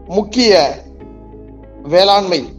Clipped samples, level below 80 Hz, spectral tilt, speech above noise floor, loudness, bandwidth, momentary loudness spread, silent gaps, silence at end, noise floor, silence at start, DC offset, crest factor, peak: under 0.1%; -40 dBFS; -4 dB/octave; 23 dB; -12 LUFS; 11.5 kHz; 16 LU; none; 0.05 s; -35 dBFS; 0.05 s; under 0.1%; 14 dB; 0 dBFS